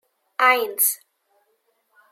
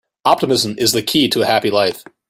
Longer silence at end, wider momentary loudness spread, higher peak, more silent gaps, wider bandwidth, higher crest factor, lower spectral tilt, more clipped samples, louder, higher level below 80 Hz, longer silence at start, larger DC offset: first, 1.15 s vs 0.3 s; first, 16 LU vs 3 LU; second, -4 dBFS vs 0 dBFS; neither; about the same, 16.5 kHz vs 16 kHz; about the same, 20 dB vs 16 dB; second, 2 dB/octave vs -3.5 dB/octave; neither; second, -19 LUFS vs -15 LUFS; second, under -90 dBFS vs -54 dBFS; first, 0.4 s vs 0.25 s; neither